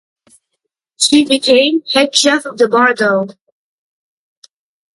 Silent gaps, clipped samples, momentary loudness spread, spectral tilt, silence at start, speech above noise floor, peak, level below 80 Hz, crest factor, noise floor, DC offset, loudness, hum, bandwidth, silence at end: none; under 0.1%; 5 LU; -2 dB/octave; 1 s; 62 dB; 0 dBFS; -62 dBFS; 16 dB; -74 dBFS; under 0.1%; -12 LUFS; none; 11.5 kHz; 1.65 s